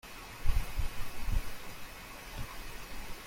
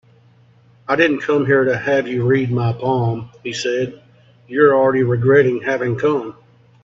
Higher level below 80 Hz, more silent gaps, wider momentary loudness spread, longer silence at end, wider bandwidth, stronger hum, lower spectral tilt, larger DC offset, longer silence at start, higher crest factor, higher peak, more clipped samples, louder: first, -38 dBFS vs -58 dBFS; neither; second, 8 LU vs 11 LU; second, 0 s vs 0.5 s; first, 16.5 kHz vs 7.6 kHz; neither; second, -4 dB/octave vs -7 dB/octave; neither; second, 0.05 s vs 0.9 s; about the same, 20 dB vs 18 dB; second, -14 dBFS vs 0 dBFS; neither; second, -42 LUFS vs -17 LUFS